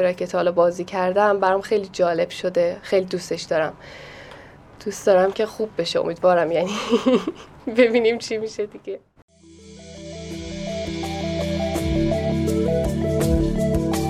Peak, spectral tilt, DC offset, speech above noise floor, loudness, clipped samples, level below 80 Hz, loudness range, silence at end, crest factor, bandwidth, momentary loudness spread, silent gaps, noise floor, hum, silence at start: -4 dBFS; -6 dB/octave; under 0.1%; 24 dB; -21 LUFS; under 0.1%; -38 dBFS; 7 LU; 0 s; 18 dB; 15.5 kHz; 16 LU; 9.22-9.28 s; -45 dBFS; none; 0 s